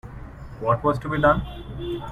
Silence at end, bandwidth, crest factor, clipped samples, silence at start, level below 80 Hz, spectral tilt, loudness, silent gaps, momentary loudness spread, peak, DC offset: 0 s; 13.5 kHz; 20 dB; under 0.1%; 0.05 s; -38 dBFS; -8 dB/octave; -23 LUFS; none; 21 LU; -6 dBFS; under 0.1%